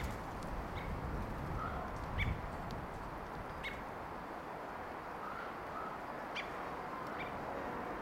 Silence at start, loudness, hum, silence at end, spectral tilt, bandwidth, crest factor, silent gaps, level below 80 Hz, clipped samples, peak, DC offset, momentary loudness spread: 0 s; -43 LUFS; none; 0 s; -6 dB/octave; 16 kHz; 20 dB; none; -50 dBFS; under 0.1%; -24 dBFS; under 0.1%; 5 LU